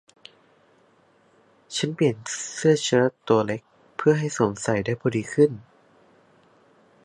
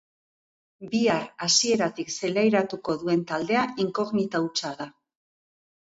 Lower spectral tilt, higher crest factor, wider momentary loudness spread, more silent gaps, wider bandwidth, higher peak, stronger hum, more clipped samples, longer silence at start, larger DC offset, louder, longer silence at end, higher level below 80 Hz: first, -5 dB/octave vs -3.5 dB/octave; about the same, 20 dB vs 18 dB; about the same, 9 LU vs 9 LU; neither; first, 11.5 kHz vs 8 kHz; first, -4 dBFS vs -8 dBFS; neither; neither; first, 1.7 s vs 0.8 s; neither; about the same, -23 LUFS vs -25 LUFS; first, 1.45 s vs 0.95 s; first, -62 dBFS vs -68 dBFS